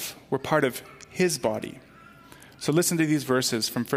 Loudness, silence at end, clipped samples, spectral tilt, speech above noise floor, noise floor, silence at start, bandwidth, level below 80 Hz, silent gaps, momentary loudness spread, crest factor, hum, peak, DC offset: -25 LUFS; 0 s; under 0.1%; -4 dB/octave; 25 dB; -50 dBFS; 0 s; 16 kHz; -64 dBFS; none; 12 LU; 18 dB; none; -8 dBFS; under 0.1%